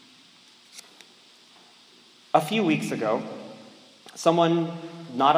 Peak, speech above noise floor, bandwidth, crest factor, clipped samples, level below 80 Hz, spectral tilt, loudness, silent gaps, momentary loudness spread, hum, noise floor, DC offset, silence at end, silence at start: -4 dBFS; 31 dB; 16 kHz; 22 dB; under 0.1%; -82 dBFS; -5.5 dB/octave; -25 LUFS; none; 24 LU; none; -54 dBFS; under 0.1%; 0 s; 0.75 s